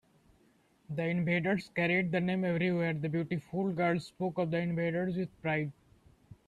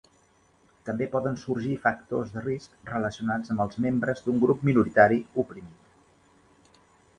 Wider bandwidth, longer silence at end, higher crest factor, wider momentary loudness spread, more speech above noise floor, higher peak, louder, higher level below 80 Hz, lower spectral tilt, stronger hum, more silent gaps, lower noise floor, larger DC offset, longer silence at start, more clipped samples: about the same, 9.6 kHz vs 9.6 kHz; second, 0.15 s vs 1.45 s; second, 16 dB vs 24 dB; second, 6 LU vs 14 LU; about the same, 36 dB vs 37 dB; second, -16 dBFS vs -4 dBFS; second, -32 LUFS vs -26 LUFS; second, -68 dBFS vs -58 dBFS; about the same, -8 dB/octave vs -8 dB/octave; neither; neither; first, -67 dBFS vs -63 dBFS; neither; about the same, 0.9 s vs 0.85 s; neither